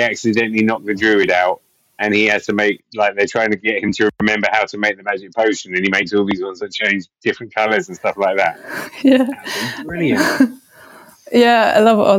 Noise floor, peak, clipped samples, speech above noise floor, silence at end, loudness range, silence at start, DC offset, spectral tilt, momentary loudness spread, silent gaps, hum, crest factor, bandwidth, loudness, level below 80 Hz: -43 dBFS; 0 dBFS; under 0.1%; 27 dB; 0 s; 2 LU; 0 s; under 0.1%; -4.5 dB/octave; 10 LU; none; none; 16 dB; 16.5 kHz; -16 LUFS; -56 dBFS